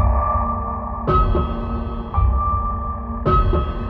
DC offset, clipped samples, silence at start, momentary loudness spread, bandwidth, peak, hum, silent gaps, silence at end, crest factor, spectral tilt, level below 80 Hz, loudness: under 0.1%; under 0.1%; 0 s; 8 LU; 4.7 kHz; -4 dBFS; none; none; 0 s; 14 dB; -10.5 dB/octave; -22 dBFS; -21 LUFS